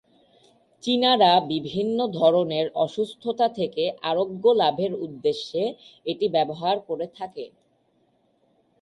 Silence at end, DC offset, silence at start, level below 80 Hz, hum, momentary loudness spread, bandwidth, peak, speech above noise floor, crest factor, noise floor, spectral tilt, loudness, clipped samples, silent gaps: 1.35 s; under 0.1%; 0.85 s; -70 dBFS; none; 13 LU; 11.5 kHz; -6 dBFS; 43 dB; 18 dB; -66 dBFS; -6 dB/octave; -23 LUFS; under 0.1%; none